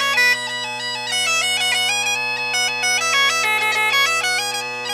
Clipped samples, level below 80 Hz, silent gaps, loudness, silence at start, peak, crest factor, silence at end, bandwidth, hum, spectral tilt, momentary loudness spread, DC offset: under 0.1%; -70 dBFS; none; -17 LUFS; 0 s; -6 dBFS; 14 dB; 0 s; 16 kHz; none; 1 dB/octave; 8 LU; under 0.1%